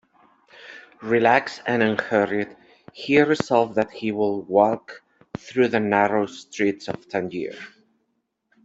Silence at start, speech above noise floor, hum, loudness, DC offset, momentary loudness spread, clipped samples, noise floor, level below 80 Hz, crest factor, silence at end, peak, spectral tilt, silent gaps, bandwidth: 0.6 s; 52 dB; none; -22 LUFS; under 0.1%; 20 LU; under 0.1%; -74 dBFS; -64 dBFS; 20 dB; 0.95 s; -4 dBFS; -6 dB/octave; none; 8 kHz